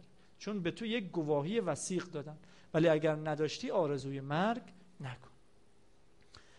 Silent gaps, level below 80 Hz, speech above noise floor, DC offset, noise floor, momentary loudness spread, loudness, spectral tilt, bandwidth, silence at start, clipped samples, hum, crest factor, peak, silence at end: none; -72 dBFS; 33 dB; under 0.1%; -68 dBFS; 16 LU; -35 LUFS; -5.5 dB/octave; 11.5 kHz; 0.4 s; under 0.1%; none; 18 dB; -18 dBFS; 0.2 s